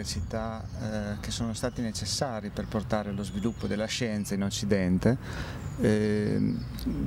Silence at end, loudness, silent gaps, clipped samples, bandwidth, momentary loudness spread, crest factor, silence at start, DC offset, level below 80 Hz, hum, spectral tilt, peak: 0 s; -30 LUFS; none; under 0.1%; 16 kHz; 8 LU; 18 dB; 0 s; under 0.1%; -44 dBFS; none; -5.5 dB/octave; -10 dBFS